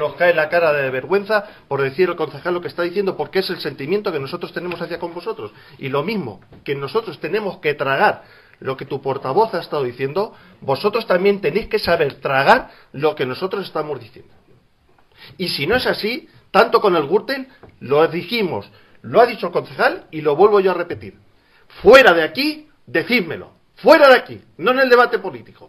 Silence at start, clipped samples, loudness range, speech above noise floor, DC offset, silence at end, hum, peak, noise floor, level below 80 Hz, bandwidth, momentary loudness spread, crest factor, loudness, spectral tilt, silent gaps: 0 s; under 0.1%; 9 LU; 37 dB; under 0.1%; 0.05 s; none; 0 dBFS; -55 dBFS; -52 dBFS; 15.5 kHz; 15 LU; 18 dB; -18 LUFS; -5.5 dB/octave; none